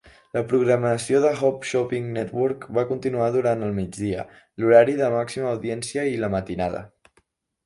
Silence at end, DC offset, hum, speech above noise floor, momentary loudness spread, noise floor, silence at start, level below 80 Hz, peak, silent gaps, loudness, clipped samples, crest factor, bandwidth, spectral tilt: 0.8 s; under 0.1%; none; 43 dB; 11 LU; -66 dBFS; 0.35 s; -54 dBFS; -2 dBFS; none; -23 LUFS; under 0.1%; 20 dB; 11.5 kHz; -6 dB/octave